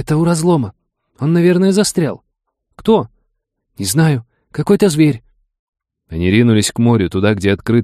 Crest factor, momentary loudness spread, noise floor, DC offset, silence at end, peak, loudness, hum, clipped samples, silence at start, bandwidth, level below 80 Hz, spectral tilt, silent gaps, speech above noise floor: 14 dB; 12 LU; -69 dBFS; under 0.1%; 0 s; 0 dBFS; -14 LUFS; none; under 0.1%; 0 s; 15 kHz; -44 dBFS; -6 dB/octave; 5.59-5.73 s; 56 dB